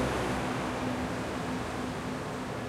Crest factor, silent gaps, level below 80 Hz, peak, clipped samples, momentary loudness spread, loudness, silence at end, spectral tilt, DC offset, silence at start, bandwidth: 14 dB; none; -48 dBFS; -18 dBFS; under 0.1%; 4 LU; -34 LUFS; 0 s; -5.5 dB/octave; under 0.1%; 0 s; 16 kHz